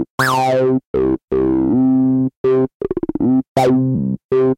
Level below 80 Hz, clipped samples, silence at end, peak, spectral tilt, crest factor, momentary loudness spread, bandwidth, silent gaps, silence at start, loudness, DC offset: -42 dBFS; under 0.1%; 0.05 s; -2 dBFS; -7 dB/octave; 14 dB; 5 LU; 16.5 kHz; 0.10-0.18 s, 0.86-0.94 s, 1.24-1.28 s, 2.37-2.44 s, 2.75-2.80 s, 3.48-3.55 s, 4.24-4.29 s; 0 s; -16 LUFS; under 0.1%